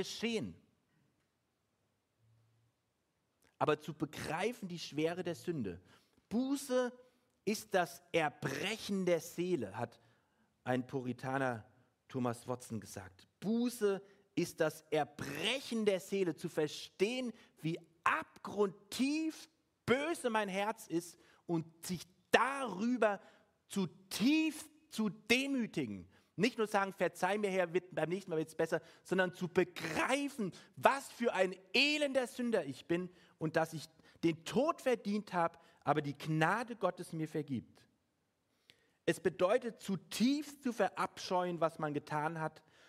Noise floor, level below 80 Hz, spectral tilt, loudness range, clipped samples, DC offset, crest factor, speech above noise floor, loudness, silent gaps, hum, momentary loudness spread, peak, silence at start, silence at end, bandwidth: -82 dBFS; -76 dBFS; -5 dB/octave; 5 LU; under 0.1%; under 0.1%; 28 dB; 46 dB; -37 LUFS; none; none; 11 LU; -10 dBFS; 0 s; 0.4 s; 16 kHz